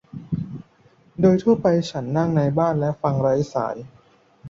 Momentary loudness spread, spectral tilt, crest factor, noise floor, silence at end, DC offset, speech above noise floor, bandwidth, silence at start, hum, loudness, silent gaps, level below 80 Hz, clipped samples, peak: 15 LU; -8 dB/octave; 18 dB; -56 dBFS; 0 s; under 0.1%; 36 dB; 7.8 kHz; 0.15 s; none; -21 LUFS; none; -52 dBFS; under 0.1%; -4 dBFS